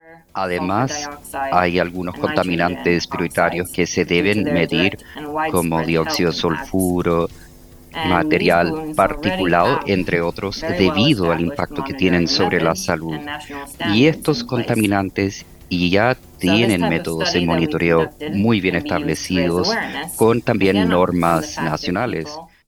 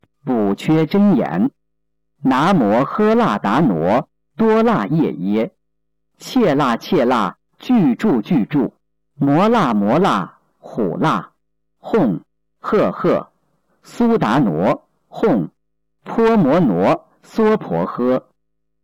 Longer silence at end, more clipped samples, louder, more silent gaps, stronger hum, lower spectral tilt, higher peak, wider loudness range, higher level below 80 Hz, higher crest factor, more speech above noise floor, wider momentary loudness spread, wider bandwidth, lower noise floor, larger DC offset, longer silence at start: second, 0.2 s vs 0.65 s; neither; about the same, -18 LUFS vs -17 LUFS; neither; neither; second, -5 dB/octave vs -7.5 dB/octave; first, 0 dBFS vs -8 dBFS; about the same, 2 LU vs 4 LU; first, -42 dBFS vs -52 dBFS; first, 18 dB vs 8 dB; second, 24 dB vs 61 dB; about the same, 9 LU vs 9 LU; first, 19.5 kHz vs 17 kHz; second, -43 dBFS vs -76 dBFS; neither; second, 0.05 s vs 0.25 s